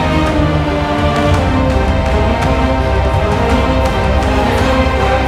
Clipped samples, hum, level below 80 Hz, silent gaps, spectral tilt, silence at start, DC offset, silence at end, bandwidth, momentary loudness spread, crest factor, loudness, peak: under 0.1%; none; -18 dBFS; none; -6.5 dB/octave; 0 s; under 0.1%; 0 s; 13 kHz; 1 LU; 12 dB; -13 LUFS; 0 dBFS